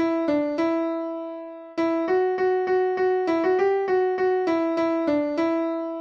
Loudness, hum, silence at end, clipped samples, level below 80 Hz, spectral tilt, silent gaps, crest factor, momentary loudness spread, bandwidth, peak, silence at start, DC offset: -23 LUFS; none; 0 s; under 0.1%; -66 dBFS; -6.5 dB/octave; none; 12 dB; 7 LU; 6.8 kHz; -12 dBFS; 0 s; under 0.1%